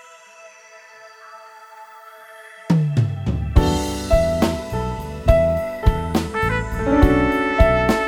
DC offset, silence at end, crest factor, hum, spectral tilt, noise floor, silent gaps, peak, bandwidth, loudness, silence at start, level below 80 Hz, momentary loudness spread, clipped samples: under 0.1%; 0 s; 20 dB; none; -6.5 dB/octave; -45 dBFS; none; 0 dBFS; 17 kHz; -19 LUFS; 0.45 s; -26 dBFS; 24 LU; under 0.1%